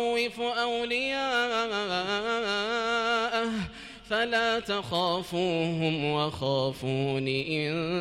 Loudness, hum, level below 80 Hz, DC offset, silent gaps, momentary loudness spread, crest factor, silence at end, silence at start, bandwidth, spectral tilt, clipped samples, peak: -28 LUFS; none; -58 dBFS; under 0.1%; none; 3 LU; 14 dB; 0 s; 0 s; 15 kHz; -5 dB/octave; under 0.1%; -14 dBFS